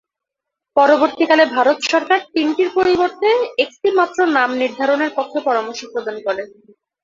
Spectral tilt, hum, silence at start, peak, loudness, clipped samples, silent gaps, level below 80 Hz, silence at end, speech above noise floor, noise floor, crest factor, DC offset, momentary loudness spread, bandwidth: -3 dB/octave; none; 0.75 s; 0 dBFS; -16 LUFS; under 0.1%; none; -60 dBFS; 0.6 s; 66 dB; -82 dBFS; 16 dB; under 0.1%; 10 LU; 7.6 kHz